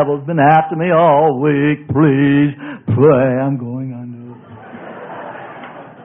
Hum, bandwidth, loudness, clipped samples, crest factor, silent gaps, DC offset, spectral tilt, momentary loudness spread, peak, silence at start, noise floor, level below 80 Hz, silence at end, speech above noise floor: none; 3.7 kHz; -13 LUFS; under 0.1%; 14 dB; none; under 0.1%; -11.5 dB/octave; 21 LU; 0 dBFS; 0 s; -35 dBFS; -52 dBFS; 0 s; 22 dB